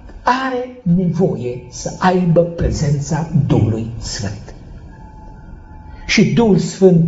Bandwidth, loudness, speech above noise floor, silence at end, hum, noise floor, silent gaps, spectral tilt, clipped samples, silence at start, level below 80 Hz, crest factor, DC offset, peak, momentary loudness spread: 8 kHz; -16 LUFS; 21 dB; 0 s; none; -36 dBFS; none; -6.5 dB/octave; under 0.1%; 0.05 s; -34 dBFS; 16 dB; under 0.1%; 0 dBFS; 15 LU